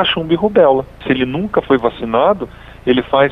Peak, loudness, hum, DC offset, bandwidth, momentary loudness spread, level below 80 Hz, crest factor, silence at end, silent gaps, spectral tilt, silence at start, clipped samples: 0 dBFS; -15 LUFS; none; under 0.1%; 5.2 kHz; 8 LU; -40 dBFS; 14 dB; 0 s; none; -8 dB/octave; 0 s; under 0.1%